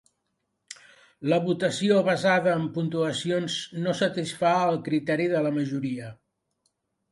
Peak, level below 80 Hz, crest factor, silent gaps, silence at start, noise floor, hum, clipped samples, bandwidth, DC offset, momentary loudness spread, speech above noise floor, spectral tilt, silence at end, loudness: -10 dBFS; -70 dBFS; 16 dB; none; 0.7 s; -78 dBFS; none; under 0.1%; 11.5 kHz; under 0.1%; 13 LU; 53 dB; -5.5 dB/octave; 1 s; -25 LUFS